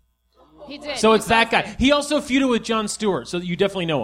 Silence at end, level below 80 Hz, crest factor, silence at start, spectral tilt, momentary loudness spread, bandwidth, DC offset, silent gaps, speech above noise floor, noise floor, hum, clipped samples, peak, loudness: 0 s; -44 dBFS; 18 dB; 0.6 s; -4 dB/octave; 10 LU; 16 kHz; under 0.1%; none; 38 dB; -58 dBFS; none; under 0.1%; -2 dBFS; -20 LUFS